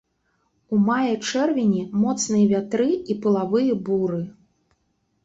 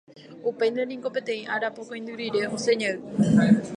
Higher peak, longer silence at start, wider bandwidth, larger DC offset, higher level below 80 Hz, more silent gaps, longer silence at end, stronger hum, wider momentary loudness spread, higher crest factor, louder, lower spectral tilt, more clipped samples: about the same, -8 dBFS vs -6 dBFS; first, 0.7 s vs 0.15 s; second, 8 kHz vs 10.5 kHz; neither; about the same, -62 dBFS vs -62 dBFS; neither; first, 0.95 s vs 0 s; neither; second, 4 LU vs 12 LU; about the same, 14 dB vs 18 dB; first, -22 LUFS vs -25 LUFS; about the same, -5.5 dB/octave vs -6 dB/octave; neither